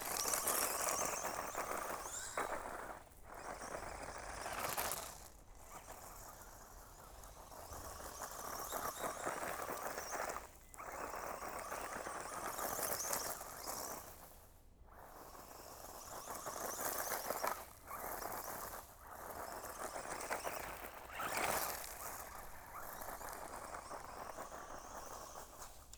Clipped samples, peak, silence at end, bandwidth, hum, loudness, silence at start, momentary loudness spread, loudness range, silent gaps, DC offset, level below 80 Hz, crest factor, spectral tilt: under 0.1%; -18 dBFS; 0 s; over 20 kHz; none; -44 LUFS; 0 s; 16 LU; 7 LU; none; under 0.1%; -62 dBFS; 28 dB; -1.5 dB/octave